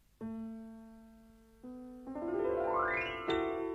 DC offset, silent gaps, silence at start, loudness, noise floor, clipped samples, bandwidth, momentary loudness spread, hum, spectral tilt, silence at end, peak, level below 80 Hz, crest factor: under 0.1%; none; 0.2 s; -36 LUFS; -60 dBFS; under 0.1%; 12 kHz; 21 LU; none; -6 dB/octave; 0 s; -22 dBFS; -62 dBFS; 16 dB